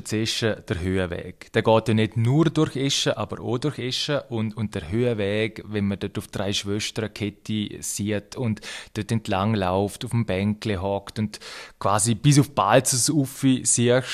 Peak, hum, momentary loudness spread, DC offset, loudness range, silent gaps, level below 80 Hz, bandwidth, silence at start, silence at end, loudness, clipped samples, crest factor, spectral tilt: -2 dBFS; none; 11 LU; under 0.1%; 6 LU; none; -54 dBFS; 15 kHz; 0 s; 0 s; -24 LUFS; under 0.1%; 20 dB; -4.5 dB/octave